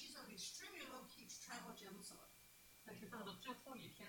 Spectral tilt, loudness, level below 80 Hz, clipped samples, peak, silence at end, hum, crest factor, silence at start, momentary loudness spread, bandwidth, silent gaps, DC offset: -2.5 dB/octave; -55 LUFS; -82 dBFS; under 0.1%; -36 dBFS; 0 s; 60 Hz at -70 dBFS; 20 dB; 0 s; 11 LU; 19 kHz; none; under 0.1%